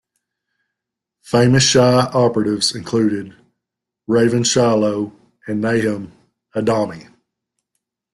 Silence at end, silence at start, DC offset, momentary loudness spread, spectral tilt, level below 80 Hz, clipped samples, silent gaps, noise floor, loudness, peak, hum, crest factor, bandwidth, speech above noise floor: 1.15 s; 1.3 s; under 0.1%; 15 LU; -4.5 dB/octave; -52 dBFS; under 0.1%; none; -82 dBFS; -16 LUFS; -2 dBFS; none; 18 dB; 12 kHz; 67 dB